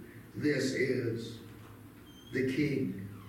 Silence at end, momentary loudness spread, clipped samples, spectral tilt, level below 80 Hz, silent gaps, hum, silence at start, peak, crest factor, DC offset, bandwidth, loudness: 0 s; 21 LU; under 0.1%; -6 dB/octave; -64 dBFS; none; none; 0 s; -18 dBFS; 16 dB; under 0.1%; 17 kHz; -33 LUFS